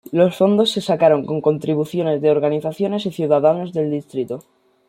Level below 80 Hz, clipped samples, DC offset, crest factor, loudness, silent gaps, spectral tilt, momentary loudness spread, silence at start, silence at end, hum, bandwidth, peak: -64 dBFS; under 0.1%; under 0.1%; 16 dB; -18 LUFS; none; -6.5 dB/octave; 9 LU; 0.1 s; 0.5 s; none; 15.5 kHz; -2 dBFS